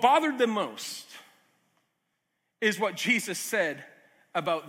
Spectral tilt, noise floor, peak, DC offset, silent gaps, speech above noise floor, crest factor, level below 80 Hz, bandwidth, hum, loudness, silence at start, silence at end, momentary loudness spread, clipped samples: -3 dB/octave; -79 dBFS; -8 dBFS; under 0.1%; none; 52 dB; 22 dB; -86 dBFS; 16.5 kHz; none; -28 LUFS; 0 s; 0 s; 17 LU; under 0.1%